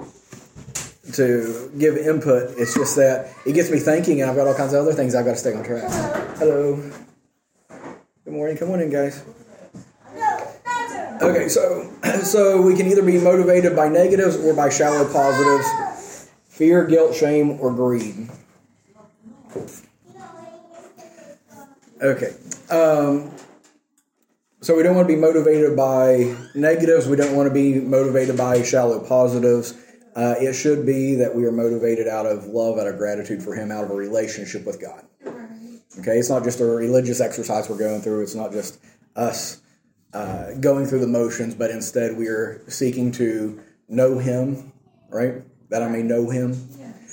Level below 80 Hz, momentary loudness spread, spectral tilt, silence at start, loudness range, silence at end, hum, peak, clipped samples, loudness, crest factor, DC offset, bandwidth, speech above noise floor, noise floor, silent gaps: -60 dBFS; 16 LU; -6 dB/octave; 0 s; 9 LU; 0 s; none; -4 dBFS; under 0.1%; -19 LUFS; 16 dB; under 0.1%; 17 kHz; 50 dB; -68 dBFS; none